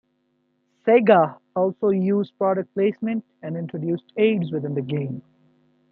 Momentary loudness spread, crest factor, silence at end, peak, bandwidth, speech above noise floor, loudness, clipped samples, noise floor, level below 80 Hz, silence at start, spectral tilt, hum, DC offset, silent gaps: 13 LU; 20 dB; 0.7 s; -2 dBFS; 4.6 kHz; 48 dB; -22 LUFS; under 0.1%; -69 dBFS; -70 dBFS; 0.85 s; -11 dB/octave; 50 Hz at -45 dBFS; under 0.1%; none